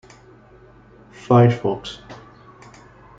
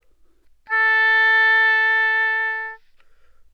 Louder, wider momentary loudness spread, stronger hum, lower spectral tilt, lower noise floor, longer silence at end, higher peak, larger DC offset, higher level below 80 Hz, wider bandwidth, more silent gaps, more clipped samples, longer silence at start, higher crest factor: about the same, -18 LUFS vs -16 LUFS; first, 27 LU vs 10 LU; neither; first, -8 dB/octave vs 1 dB/octave; second, -48 dBFS vs -54 dBFS; first, 1.05 s vs 0.75 s; first, -2 dBFS vs -8 dBFS; neither; first, -54 dBFS vs -62 dBFS; first, 7.6 kHz vs 6.6 kHz; neither; neither; first, 1.3 s vs 0.7 s; first, 20 dB vs 12 dB